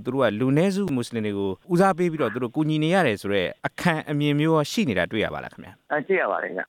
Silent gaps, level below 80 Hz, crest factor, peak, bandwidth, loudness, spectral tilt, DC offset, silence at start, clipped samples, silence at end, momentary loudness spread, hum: none; -58 dBFS; 16 dB; -6 dBFS; 16 kHz; -23 LUFS; -6.5 dB/octave; under 0.1%; 0 s; under 0.1%; 0.05 s; 8 LU; none